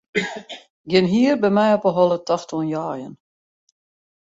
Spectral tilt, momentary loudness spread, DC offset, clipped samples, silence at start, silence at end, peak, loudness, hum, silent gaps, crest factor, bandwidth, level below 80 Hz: -6 dB/octave; 18 LU; under 0.1%; under 0.1%; 0.15 s; 1.1 s; -4 dBFS; -19 LUFS; none; 0.70-0.84 s; 18 dB; 8 kHz; -62 dBFS